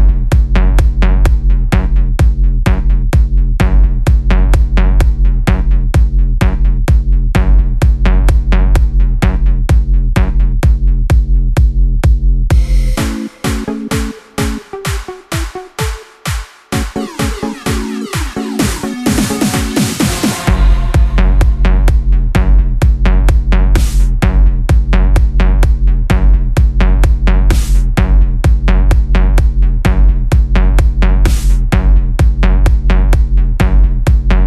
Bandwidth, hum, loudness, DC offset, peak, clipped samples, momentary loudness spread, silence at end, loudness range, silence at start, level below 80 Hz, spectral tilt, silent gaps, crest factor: 13.5 kHz; none; -13 LUFS; under 0.1%; 0 dBFS; under 0.1%; 7 LU; 0 s; 6 LU; 0 s; -10 dBFS; -6 dB/octave; none; 10 dB